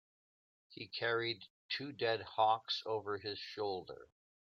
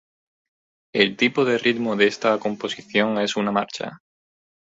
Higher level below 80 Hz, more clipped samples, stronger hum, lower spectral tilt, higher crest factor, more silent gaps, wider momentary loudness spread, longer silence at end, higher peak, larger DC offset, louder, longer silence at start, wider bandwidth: second, -82 dBFS vs -66 dBFS; neither; neither; about the same, -5 dB/octave vs -4.5 dB/octave; about the same, 22 dB vs 20 dB; first, 1.50-1.69 s vs none; first, 15 LU vs 10 LU; second, 0.45 s vs 0.7 s; second, -18 dBFS vs -2 dBFS; neither; second, -38 LUFS vs -21 LUFS; second, 0.7 s vs 0.95 s; about the same, 7.4 kHz vs 8 kHz